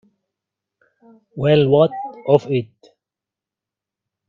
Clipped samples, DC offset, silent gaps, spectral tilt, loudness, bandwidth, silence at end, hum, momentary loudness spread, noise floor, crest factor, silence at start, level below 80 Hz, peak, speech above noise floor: under 0.1%; under 0.1%; none; -8.5 dB/octave; -17 LUFS; 7.2 kHz; 1.65 s; none; 18 LU; -87 dBFS; 20 dB; 1.35 s; -58 dBFS; 0 dBFS; 70 dB